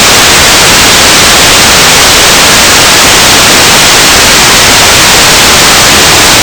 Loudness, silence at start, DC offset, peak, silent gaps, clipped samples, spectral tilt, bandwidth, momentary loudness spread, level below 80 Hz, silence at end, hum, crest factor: 0 LUFS; 0 s; 0.5%; 0 dBFS; none; 40%; -1 dB/octave; over 20 kHz; 0 LU; -22 dBFS; 0 s; none; 2 dB